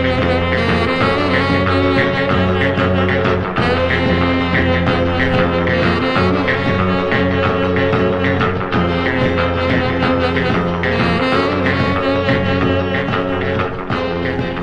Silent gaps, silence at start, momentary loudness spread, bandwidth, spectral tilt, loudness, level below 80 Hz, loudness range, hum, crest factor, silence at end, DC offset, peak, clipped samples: none; 0 s; 3 LU; 9.2 kHz; -7.5 dB/octave; -15 LUFS; -34 dBFS; 1 LU; none; 14 dB; 0 s; under 0.1%; -2 dBFS; under 0.1%